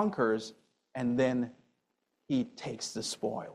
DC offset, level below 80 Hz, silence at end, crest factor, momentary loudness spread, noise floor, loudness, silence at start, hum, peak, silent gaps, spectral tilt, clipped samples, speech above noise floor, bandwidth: under 0.1%; -70 dBFS; 0 s; 18 dB; 10 LU; -80 dBFS; -33 LUFS; 0 s; none; -16 dBFS; none; -5 dB/octave; under 0.1%; 48 dB; 13 kHz